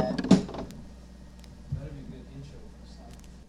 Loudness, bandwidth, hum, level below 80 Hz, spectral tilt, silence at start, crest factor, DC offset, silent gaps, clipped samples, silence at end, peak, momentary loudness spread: -28 LUFS; 11 kHz; none; -48 dBFS; -7 dB/octave; 0 s; 26 dB; under 0.1%; none; under 0.1%; 0.05 s; -6 dBFS; 25 LU